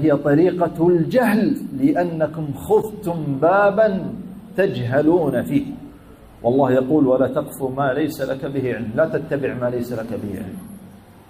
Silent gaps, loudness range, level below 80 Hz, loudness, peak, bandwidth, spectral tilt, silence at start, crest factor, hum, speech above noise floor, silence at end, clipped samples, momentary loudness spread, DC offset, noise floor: none; 4 LU; -50 dBFS; -19 LUFS; -6 dBFS; 15.5 kHz; -8 dB/octave; 0 s; 14 dB; none; 25 dB; 0.35 s; under 0.1%; 12 LU; under 0.1%; -43 dBFS